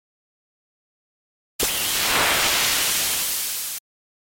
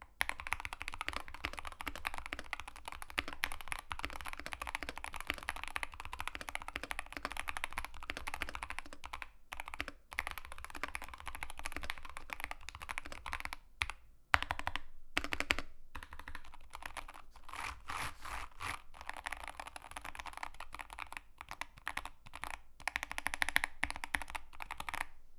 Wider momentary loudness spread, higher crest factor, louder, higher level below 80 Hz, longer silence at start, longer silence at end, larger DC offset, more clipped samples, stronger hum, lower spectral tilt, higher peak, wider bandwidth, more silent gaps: second, 9 LU vs 12 LU; second, 16 dB vs 38 dB; first, -20 LUFS vs -42 LUFS; about the same, -50 dBFS vs -52 dBFS; first, 1.6 s vs 0 s; first, 0.45 s vs 0 s; neither; neither; neither; second, 0.5 dB/octave vs -2 dB/octave; about the same, -8 dBFS vs -6 dBFS; about the same, 17 kHz vs 16.5 kHz; neither